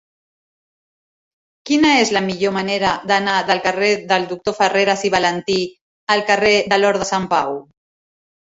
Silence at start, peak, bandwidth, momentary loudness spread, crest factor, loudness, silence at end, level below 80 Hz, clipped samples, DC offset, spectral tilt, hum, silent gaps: 1.65 s; -2 dBFS; 8 kHz; 7 LU; 18 dB; -17 LUFS; 0.85 s; -54 dBFS; under 0.1%; under 0.1%; -3.5 dB/octave; none; 5.81-6.07 s